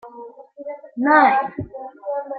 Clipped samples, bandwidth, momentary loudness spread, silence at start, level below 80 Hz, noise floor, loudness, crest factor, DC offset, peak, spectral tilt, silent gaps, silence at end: under 0.1%; 4.8 kHz; 23 LU; 0.05 s; -58 dBFS; -40 dBFS; -18 LUFS; 18 dB; under 0.1%; -2 dBFS; -9.5 dB/octave; none; 0 s